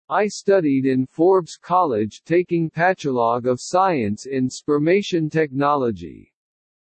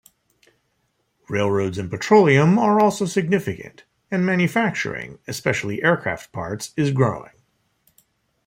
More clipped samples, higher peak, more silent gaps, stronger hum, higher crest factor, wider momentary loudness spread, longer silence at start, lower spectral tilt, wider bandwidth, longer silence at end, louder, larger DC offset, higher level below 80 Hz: neither; about the same, -6 dBFS vs -4 dBFS; neither; neither; about the same, 14 dB vs 18 dB; second, 6 LU vs 15 LU; second, 0.1 s vs 1.3 s; about the same, -6 dB/octave vs -6 dB/octave; second, 8.8 kHz vs 16.5 kHz; second, 0.85 s vs 1.2 s; about the same, -20 LUFS vs -20 LUFS; neither; second, -64 dBFS vs -58 dBFS